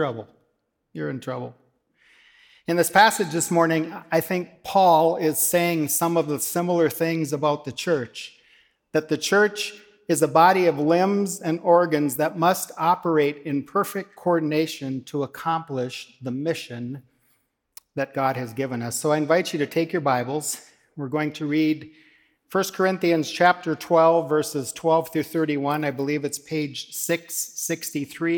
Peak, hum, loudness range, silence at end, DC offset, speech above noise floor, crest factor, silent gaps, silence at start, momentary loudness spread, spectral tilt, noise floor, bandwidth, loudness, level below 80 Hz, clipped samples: -4 dBFS; none; 7 LU; 0 s; under 0.1%; 50 dB; 20 dB; none; 0 s; 12 LU; -4.5 dB/octave; -73 dBFS; 19 kHz; -23 LUFS; -72 dBFS; under 0.1%